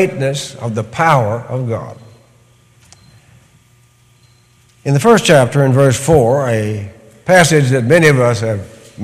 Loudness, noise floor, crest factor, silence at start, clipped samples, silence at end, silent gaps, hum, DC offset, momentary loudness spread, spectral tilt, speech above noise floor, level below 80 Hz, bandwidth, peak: -12 LUFS; -50 dBFS; 14 dB; 0 s; under 0.1%; 0 s; none; none; under 0.1%; 15 LU; -5.5 dB/octave; 38 dB; -44 dBFS; 15.5 kHz; 0 dBFS